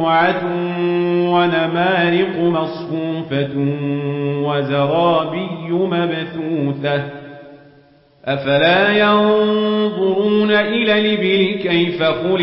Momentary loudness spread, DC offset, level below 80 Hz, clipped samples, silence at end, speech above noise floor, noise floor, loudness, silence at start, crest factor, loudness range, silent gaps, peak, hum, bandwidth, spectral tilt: 9 LU; under 0.1%; -60 dBFS; under 0.1%; 0 s; 33 dB; -50 dBFS; -17 LUFS; 0 s; 14 dB; 5 LU; none; -4 dBFS; none; 5.8 kHz; -11.5 dB/octave